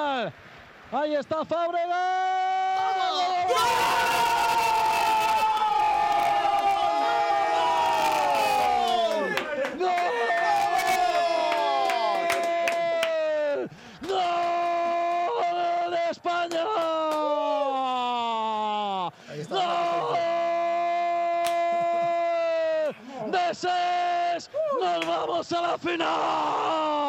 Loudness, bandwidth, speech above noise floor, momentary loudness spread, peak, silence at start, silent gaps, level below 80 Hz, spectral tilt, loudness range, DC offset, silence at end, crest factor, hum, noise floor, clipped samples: -25 LUFS; 16.5 kHz; 23 dB; 5 LU; -8 dBFS; 0 s; none; -62 dBFS; -3 dB/octave; 4 LU; under 0.1%; 0 s; 16 dB; none; -48 dBFS; under 0.1%